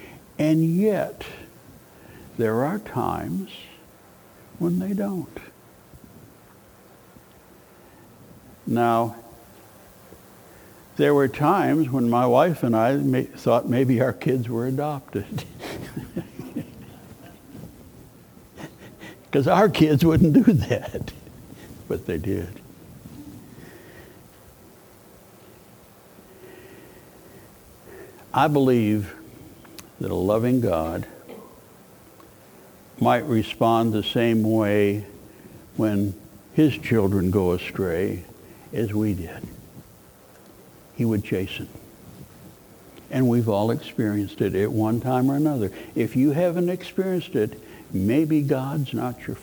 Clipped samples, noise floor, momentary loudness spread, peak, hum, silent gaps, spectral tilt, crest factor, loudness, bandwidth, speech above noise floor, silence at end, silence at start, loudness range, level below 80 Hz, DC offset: under 0.1%; -51 dBFS; 24 LU; -4 dBFS; none; none; -7.5 dB/octave; 22 dB; -23 LUFS; over 20 kHz; 29 dB; 0 s; 0 s; 12 LU; -52 dBFS; under 0.1%